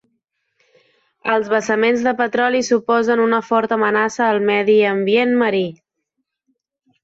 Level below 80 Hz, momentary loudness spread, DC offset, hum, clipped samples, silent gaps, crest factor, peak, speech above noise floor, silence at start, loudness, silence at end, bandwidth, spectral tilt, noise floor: -64 dBFS; 4 LU; under 0.1%; none; under 0.1%; none; 14 dB; -4 dBFS; 59 dB; 1.25 s; -17 LUFS; 1.3 s; 8 kHz; -4.5 dB/octave; -75 dBFS